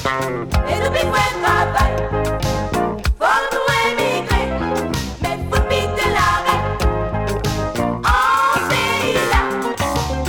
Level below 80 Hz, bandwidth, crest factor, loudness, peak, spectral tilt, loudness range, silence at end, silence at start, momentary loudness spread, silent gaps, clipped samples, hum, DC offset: -26 dBFS; 19.5 kHz; 16 dB; -18 LUFS; -2 dBFS; -4.5 dB/octave; 1 LU; 0 s; 0 s; 5 LU; none; under 0.1%; none; under 0.1%